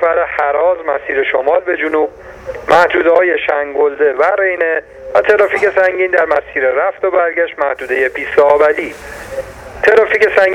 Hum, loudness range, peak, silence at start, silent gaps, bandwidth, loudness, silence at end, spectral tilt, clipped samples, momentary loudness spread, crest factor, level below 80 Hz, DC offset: none; 1 LU; 0 dBFS; 0 s; none; 12.5 kHz; -13 LUFS; 0 s; -4.5 dB/octave; under 0.1%; 11 LU; 12 dB; -44 dBFS; under 0.1%